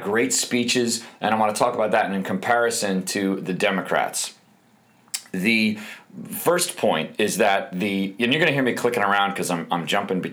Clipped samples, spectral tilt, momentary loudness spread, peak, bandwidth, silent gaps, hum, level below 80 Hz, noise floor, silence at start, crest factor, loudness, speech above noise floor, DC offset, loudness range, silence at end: under 0.1%; -3.5 dB/octave; 6 LU; -6 dBFS; over 20 kHz; none; none; -72 dBFS; -57 dBFS; 0 s; 18 dB; -22 LUFS; 35 dB; under 0.1%; 3 LU; 0 s